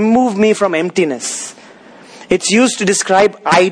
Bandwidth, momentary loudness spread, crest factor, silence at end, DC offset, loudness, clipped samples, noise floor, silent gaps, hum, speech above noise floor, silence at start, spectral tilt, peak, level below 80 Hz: 10.5 kHz; 9 LU; 14 dB; 0 s; under 0.1%; -13 LUFS; under 0.1%; -39 dBFS; none; none; 27 dB; 0 s; -3.5 dB/octave; 0 dBFS; -52 dBFS